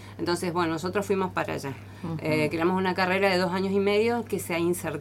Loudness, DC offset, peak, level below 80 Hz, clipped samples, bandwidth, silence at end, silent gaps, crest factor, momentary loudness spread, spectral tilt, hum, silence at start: -26 LUFS; under 0.1%; -10 dBFS; -58 dBFS; under 0.1%; 16.5 kHz; 0 s; none; 16 dB; 9 LU; -5.5 dB/octave; none; 0 s